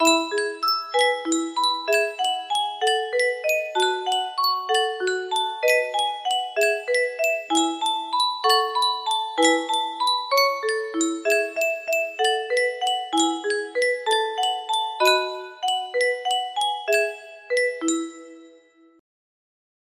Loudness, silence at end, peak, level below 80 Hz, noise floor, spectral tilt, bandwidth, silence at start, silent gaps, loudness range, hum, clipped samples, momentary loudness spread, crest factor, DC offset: -22 LUFS; 1.5 s; -4 dBFS; -74 dBFS; -54 dBFS; 0.5 dB/octave; 15.5 kHz; 0 s; none; 3 LU; none; under 0.1%; 6 LU; 18 dB; under 0.1%